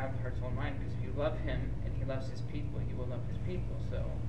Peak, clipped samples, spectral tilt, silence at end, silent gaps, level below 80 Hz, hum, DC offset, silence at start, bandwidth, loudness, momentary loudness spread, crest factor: -20 dBFS; under 0.1%; -8.5 dB/octave; 0 s; none; -42 dBFS; none; 1%; 0 s; 8.4 kHz; -38 LUFS; 4 LU; 16 dB